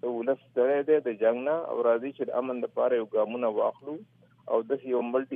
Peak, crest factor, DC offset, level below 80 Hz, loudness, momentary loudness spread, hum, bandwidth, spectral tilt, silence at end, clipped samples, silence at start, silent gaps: -12 dBFS; 16 dB; under 0.1%; -86 dBFS; -28 LUFS; 6 LU; none; 3.7 kHz; -9 dB/octave; 0 s; under 0.1%; 0.05 s; none